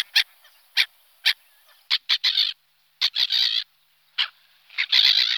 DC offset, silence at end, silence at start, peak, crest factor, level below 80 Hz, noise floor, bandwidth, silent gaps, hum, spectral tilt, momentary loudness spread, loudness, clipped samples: under 0.1%; 0 s; 0.15 s; -6 dBFS; 20 dB; under -90 dBFS; -63 dBFS; over 20 kHz; none; none; 7 dB/octave; 13 LU; -21 LUFS; under 0.1%